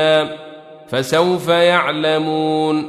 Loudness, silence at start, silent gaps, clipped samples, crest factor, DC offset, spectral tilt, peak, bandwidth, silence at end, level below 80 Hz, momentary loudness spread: -16 LUFS; 0 s; none; under 0.1%; 16 dB; under 0.1%; -5 dB/octave; -2 dBFS; 14.5 kHz; 0 s; -60 dBFS; 12 LU